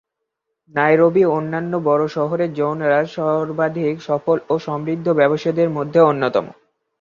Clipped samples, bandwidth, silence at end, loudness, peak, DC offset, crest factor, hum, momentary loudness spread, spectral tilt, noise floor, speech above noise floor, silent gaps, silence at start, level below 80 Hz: under 0.1%; 7.2 kHz; 0.5 s; -18 LUFS; -2 dBFS; under 0.1%; 16 dB; none; 8 LU; -8 dB/octave; -78 dBFS; 60 dB; none; 0.75 s; -62 dBFS